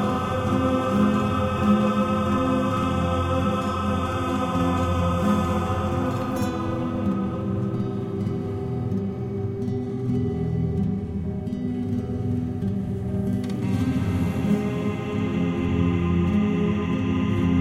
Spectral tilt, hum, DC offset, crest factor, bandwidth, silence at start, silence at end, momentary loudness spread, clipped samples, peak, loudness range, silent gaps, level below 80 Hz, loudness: -8 dB/octave; none; under 0.1%; 16 dB; 13.5 kHz; 0 s; 0 s; 6 LU; under 0.1%; -8 dBFS; 5 LU; none; -42 dBFS; -24 LUFS